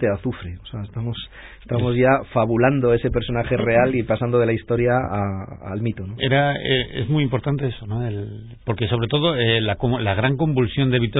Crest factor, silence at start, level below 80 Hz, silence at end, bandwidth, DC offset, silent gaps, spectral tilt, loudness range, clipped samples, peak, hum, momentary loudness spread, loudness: 16 dB; 0 s; -40 dBFS; 0 s; 4 kHz; under 0.1%; none; -11.5 dB/octave; 3 LU; under 0.1%; -4 dBFS; none; 13 LU; -21 LUFS